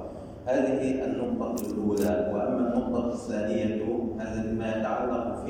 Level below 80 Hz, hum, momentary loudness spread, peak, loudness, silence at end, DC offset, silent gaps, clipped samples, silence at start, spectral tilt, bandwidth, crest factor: -50 dBFS; none; 5 LU; -14 dBFS; -29 LUFS; 0 s; under 0.1%; none; under 0.1%; 0 s; -7 dB/octave; 16.5 kHz; 14 dB